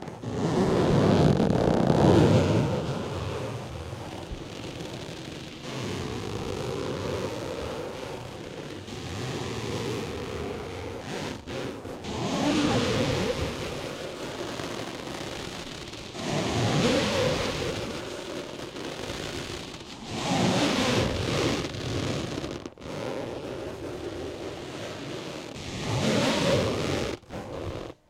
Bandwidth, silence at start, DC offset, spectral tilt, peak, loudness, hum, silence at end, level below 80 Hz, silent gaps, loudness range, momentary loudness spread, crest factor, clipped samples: 16 kHz; 0 s; under 0.1%; -5.5 dB/octave; -8 dBFS; -29 LUFS; none; 0.15 s; -46 dBFS; none; 10 LU; 14 LU; 22 dB; under 0.1%